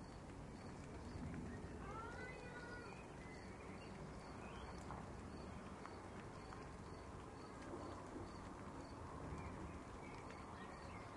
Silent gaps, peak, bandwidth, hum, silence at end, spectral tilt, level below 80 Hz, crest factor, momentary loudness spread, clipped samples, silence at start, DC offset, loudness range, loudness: none; -36 dBFS; 11.5 kHz; none; 0 s; -6 dB/octave; -62 dBFS; 16 dB; 4 LU; under 0.1%; 0 s; under 0.1%; 1 LU; -54 LUFS